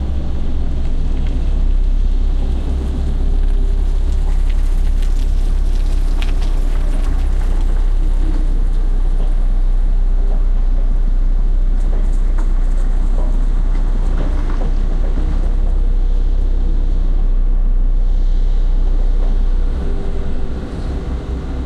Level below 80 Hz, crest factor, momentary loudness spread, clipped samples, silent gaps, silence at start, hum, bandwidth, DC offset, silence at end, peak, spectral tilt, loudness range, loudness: -12 dBFS; 8 dB; 2 LU; under 0.1%; none; 0 s; none; 4.4 kHz; under 0.1%; 0 s; -4 dBFS; -7.5 dB/octave; 1 LU; -21 LUFS